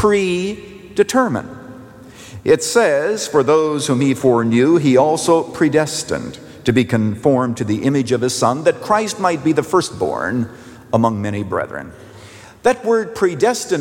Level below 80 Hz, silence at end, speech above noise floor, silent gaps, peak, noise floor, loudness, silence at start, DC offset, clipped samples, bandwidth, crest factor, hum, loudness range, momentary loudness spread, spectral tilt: -52 dBFS; 0 s; 23 dB; none; -2 dBFS; -39 dBFS; -17 LUFS; 0 s; under 0.1%; under 0.1%; 17 kHz; 14 dB; none; 5 LU; 11 LU; -5 dB/octave